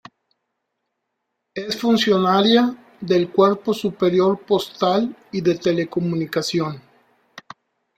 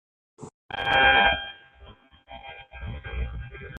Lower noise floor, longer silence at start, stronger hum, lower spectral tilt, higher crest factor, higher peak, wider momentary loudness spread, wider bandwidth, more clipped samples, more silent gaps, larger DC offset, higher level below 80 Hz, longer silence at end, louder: first, -77 dBFS vs -51 dBFS; first, 1.55 s vs 0.4 s; neither; first, -6 dB/octave vs -4.5 dB/octave; about the same, 18 dB vs 22 dB; first, -2 dBFS vs -6 dBFS; second, 11 LU vs 24 LU; first, 15.5 kHz vs 9 kHz; neither; second, none vs 0.54-0.69 s; neither; second, -62 dBFS vs -40 dBFS; first, 0.55 s vs 0 s; about the same, -19 LUFS vs -21 LUFS